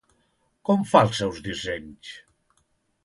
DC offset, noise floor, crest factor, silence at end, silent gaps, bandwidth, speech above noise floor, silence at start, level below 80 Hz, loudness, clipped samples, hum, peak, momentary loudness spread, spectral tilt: under 0.1%; -70 dBFS; 24 dB; 0.85 s; none; 11.5 kHz; 46 dB; 0.7 s; -54 dBFS; -23 LUFS; under 0.1%; none; -2 dBFS; 23 LU; -5.5 dB/octave